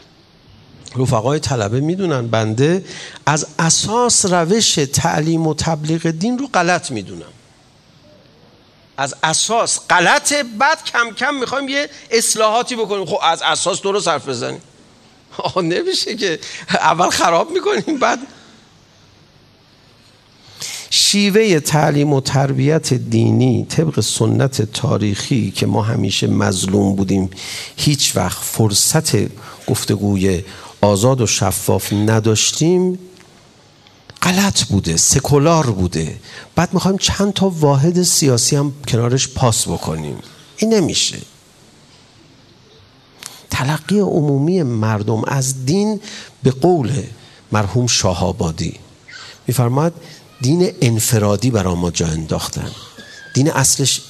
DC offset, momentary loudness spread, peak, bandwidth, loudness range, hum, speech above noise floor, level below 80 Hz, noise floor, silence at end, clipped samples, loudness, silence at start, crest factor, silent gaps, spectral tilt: under 0.1%; 11 LU; 0 dBFS; 14 kHz; 5 LU; none; 33 dB; -46 dBFS; -49 dBFS; 0 s; under 0.1%; -16 LUFS; 0.85 s; 16 dB; none; -4 dB/octave